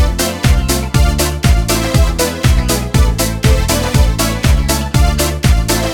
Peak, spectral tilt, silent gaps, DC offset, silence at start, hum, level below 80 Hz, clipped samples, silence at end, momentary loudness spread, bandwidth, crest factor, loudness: 0 dBFS; -4.5 dB/octave; none; under 0.1%; 0 s; none; -14 dBFS; under 0.1%; 0 s; 2 LU; 19.5 kHz; 12 dB; -13 LUFS